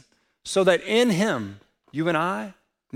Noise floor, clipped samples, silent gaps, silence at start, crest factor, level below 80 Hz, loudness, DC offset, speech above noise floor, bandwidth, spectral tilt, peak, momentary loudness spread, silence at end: -45 dBFS; under 0.1%; none; 0.45 s; 20 dB; -66 dBFS; -23 LUFS; under 0.1%; 22 dB; 16.5 kHz; -4.5 dB/octave; -6 dBFS; 17 LU; 0.45 s